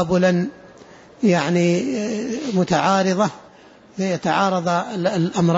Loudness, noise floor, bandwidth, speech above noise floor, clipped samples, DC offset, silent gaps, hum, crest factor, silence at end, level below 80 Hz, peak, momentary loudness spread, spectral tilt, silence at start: -20 LUFS; -47 dBFS; 8 kHz; 28 dB; under 0.1%; under 0.1%; none; none; 14 dB; 0 s; -56 dBFS; -6 dBFS; 7 LU; -6 dB/octave; 0 s